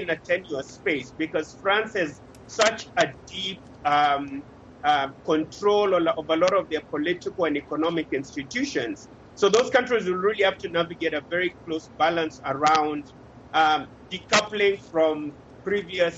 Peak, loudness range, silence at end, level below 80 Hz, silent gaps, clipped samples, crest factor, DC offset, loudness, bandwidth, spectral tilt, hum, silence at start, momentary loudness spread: -6 dBFS; 2 LU; 0 s; -58 dBFS; none; under 0.1%; 20 dB; under 0.1%; -24 LUFS; 8.4 kHz; -3.5 dB/octave; none; 0 s; 10 LU